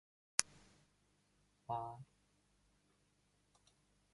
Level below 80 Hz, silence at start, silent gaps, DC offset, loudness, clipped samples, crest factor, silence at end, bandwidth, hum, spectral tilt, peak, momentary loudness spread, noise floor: -80 dBFS; 0.4 s; none; under 0.1%; -41 LUFS; under 0.1%; 42 dB; 2.1 s; 11.5 kHz; 50 Hz at -75 dBFS; -1 dB/octave; -8 dBFS; 20 LU; -78 dBFS